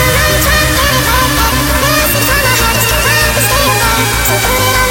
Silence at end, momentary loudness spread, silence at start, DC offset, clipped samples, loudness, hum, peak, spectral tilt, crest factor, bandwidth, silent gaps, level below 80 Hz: 0 s; 1 LU; 0 s; under 0.1%; under 0.1%; -9 LUFS; none; 0 dBFS; -3 dB/octave; 10 dB; 17.5 kHz; none; -20 dBFS